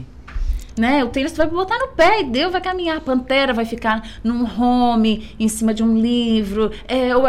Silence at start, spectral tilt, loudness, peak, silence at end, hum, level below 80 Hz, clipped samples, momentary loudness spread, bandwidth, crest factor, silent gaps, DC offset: 0 s; -5 dB/octave; -18 LUFS; -4 dBFS; 0 s; none; -32 dBFS; under 0.1%; 7 LU; 14 kHz; 12 dB; none; 1%